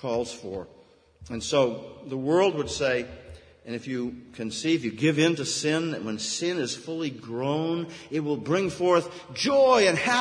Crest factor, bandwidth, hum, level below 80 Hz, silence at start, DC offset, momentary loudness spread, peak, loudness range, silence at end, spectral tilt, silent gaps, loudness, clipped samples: 18 dB; 10.5 kHz; none; -58 dBFS; 0 s; under 0.1%; 15 LU; -8 dBFS; 3 LU; 0 s; -4.5 dB/octave; none; -26 LUFS; under 0.1%